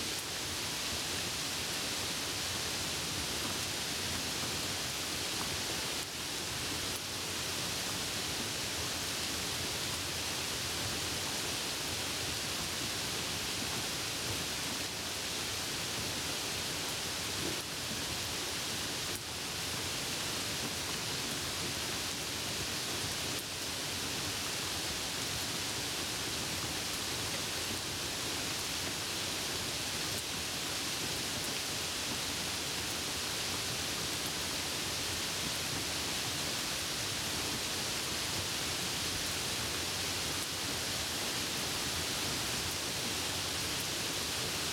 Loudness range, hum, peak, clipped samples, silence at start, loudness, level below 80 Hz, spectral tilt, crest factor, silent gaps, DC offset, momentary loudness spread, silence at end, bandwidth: 1 LU; none; -20 dBFS; under 0.1%; 0 s; -34 LUFS; -56 dBFS; -1.5 dB/octave; 18 dB; none; under 0.1%; 2 LU; 0 s; 17.5 kHz